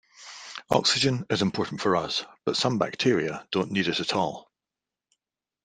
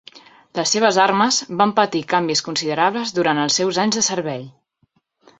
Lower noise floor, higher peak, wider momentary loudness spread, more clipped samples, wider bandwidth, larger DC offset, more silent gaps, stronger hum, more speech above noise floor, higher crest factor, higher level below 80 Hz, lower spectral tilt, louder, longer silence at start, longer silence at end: first, -89 dBFS vs -65 dBFS; second, -6 dBFS vs -2 dBFS; first, 14 LU vs 8 LU; neither; first, 13.5 kHz vs 8.4 kHz; neither; neither; neither; first, 63 dB vs 46 dB; about the same, 22 dB vs 18 dB; about the same, -64 dBFS vs -64 dBFS; first, -4 dB/octave vs -2.5 dB/octave; second, -26 LUFS vs -18 LUFS; about the same, 0.2 s vs 0.15 s; first, 1.25 s vs 0.9 s